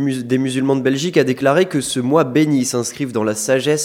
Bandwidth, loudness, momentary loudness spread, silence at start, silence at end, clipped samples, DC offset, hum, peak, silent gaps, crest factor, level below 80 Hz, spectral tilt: 16.5 kHz; -17 LUFS; 5 LU; 0 s; 0 s; under 0.1%; under 0.1%; none; 0 dBFS; none; 16 dB; -60 dBFS; -5 dB/octave